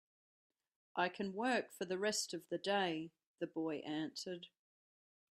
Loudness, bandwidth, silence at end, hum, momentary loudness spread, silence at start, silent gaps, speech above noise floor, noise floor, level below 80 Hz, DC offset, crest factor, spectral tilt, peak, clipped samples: -41 LUFS; 14 kHz; 0.9 s; none; 11 LU; 0.95 s; 3.26-3.35 s; over 50 dB; under -90 dBFS; -88 dBFS; under 0.1%; 20 dB; -3.5 dB/octave; -22 dBFS; under 0.1%